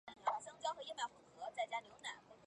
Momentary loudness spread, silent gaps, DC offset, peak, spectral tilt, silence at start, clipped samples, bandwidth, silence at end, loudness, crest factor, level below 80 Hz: 7 LU; none; under 0.1%; -26 dBFS; -1 dB/octave; 0.05 s; under 0.1%; 11 kHz; 0 s; -45 LUFS; 20 dB; -86 dBFS